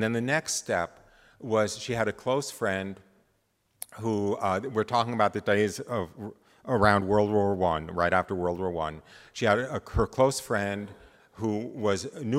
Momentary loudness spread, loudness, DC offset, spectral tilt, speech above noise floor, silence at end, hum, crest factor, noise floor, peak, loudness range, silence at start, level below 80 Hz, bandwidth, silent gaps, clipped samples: 14 LU; -28 LUFS; under 0.1%; -5 dB/octave; 44 dB; 0 s; none; 22 dB; -72 dBFS; -6 dBFS; 5 LU; 0 s; -50 dBFS; 16 kHz; none; under 0.1%